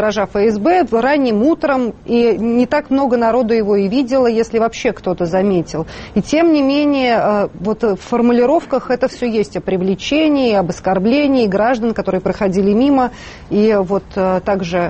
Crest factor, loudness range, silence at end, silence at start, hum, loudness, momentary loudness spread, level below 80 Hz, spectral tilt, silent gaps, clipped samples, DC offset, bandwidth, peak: 12 dB; 1 LU; 0 s; 0 s; none; -15 LUFS; 6 LU; -42 dBFS; -6.5 dB/octave; none; under 0.1%; under 0.1%; 8.4 kHz; -2 dBFS